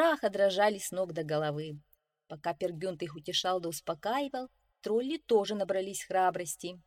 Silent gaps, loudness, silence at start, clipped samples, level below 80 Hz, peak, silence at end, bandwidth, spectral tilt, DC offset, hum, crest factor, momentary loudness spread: none; -32 LUFS; 0 s; under 0.1%; -72 dBFS; -14 dBFS; 0.05 s; 16.5 kHz; -4 dB/octave; under 0.1%; none; 18 dB; 12 LU